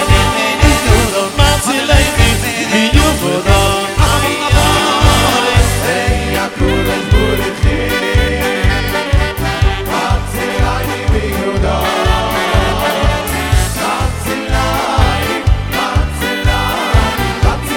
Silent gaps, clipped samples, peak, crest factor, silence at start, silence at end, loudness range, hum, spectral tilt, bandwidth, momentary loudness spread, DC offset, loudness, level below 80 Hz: none; 0.4%; 0 dBFS; 12 dB; 0 s; 0 s; 3 LU; none; -4.5 dB/octave; 18 kHz; 5 LU; under 0.1%; -13 LUFS; -18 dBFS